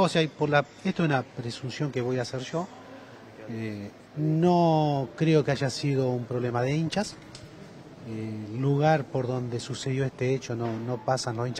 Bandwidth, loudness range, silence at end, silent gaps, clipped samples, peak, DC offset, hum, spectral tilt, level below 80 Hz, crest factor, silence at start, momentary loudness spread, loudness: 10 kHz; 5 LU; 0 s; none; under 0.1%; -8 dBFS; under 0.1%; none; -6.5 dB/octave; -62 dBFS; 20 dB; 0 s; 21 LU; -28 LUFS